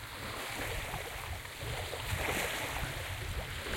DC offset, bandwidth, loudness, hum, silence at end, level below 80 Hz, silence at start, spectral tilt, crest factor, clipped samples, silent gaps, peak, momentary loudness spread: under 0.1%; 16.5 kHz; -37 LUFS; none; 0 s; -48 dBFS; 0 s; -3 dB/octave; 18 dB; under 0.1%; none; -20 dBFS; 7 LU